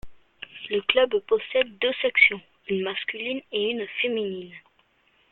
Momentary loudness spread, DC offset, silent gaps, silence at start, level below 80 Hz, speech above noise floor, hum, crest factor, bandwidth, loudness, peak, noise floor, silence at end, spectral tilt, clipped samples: 19 LU; under 0.1%; none; 0.05 s; -60 dBFS; 40 dB; none; 24 dB; 4.3 kHz; -24 LUFS; -2 dBFS; -64 dBFS; 0.75 s; -6.5 dB/octave; under 0.1%